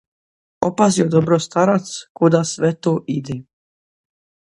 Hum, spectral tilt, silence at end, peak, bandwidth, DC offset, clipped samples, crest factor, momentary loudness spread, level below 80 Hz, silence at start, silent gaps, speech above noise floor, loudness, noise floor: none; -6 dB/octave; 1.1 s; 0 dBFS; 11 kHz; under 0.1%; under 0.1%; 18 dB; 9 LU; -58 dBFS; 0.6 s; 2.10-2.15 s; over 73 dB; -18 LUFS; under -90 dBFS